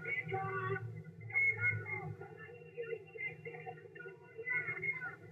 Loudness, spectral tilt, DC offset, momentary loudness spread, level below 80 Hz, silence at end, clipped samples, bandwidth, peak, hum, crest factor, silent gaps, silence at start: -38 LUFS; -7.5 dB/octave; under 0.1%; 19 LU; -78 dBFS; 0 s; under 0.1%; 8.2 kHz; -24 dBFS; none; 16 dB; none; 0 s